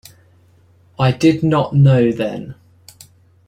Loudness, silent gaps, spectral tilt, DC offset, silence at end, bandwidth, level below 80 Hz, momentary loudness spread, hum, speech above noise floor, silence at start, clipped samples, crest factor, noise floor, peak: -15 LUFS; none; -8 dB/octave; under 0.1%; 0.95 s; 11.5 kHz; -50 dBFS; 14 LU; none; 37 dB; 1 s; under 0.1%; 16 dB; -51 dBFS; -2 dBFS